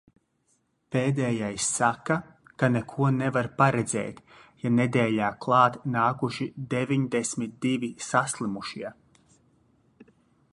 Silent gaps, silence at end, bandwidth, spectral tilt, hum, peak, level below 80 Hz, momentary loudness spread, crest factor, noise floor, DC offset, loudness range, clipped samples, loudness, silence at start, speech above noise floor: none; 0.5 s; 11.5 kHz; -5.5 dB/octave; none; -6 dBFS; -64 dBFS; 9 LU; 22 dB; -71 dBFS; under 0.1%; 5 LU; under 0.1%; -26 LUFS; 0.9 s; 45 dB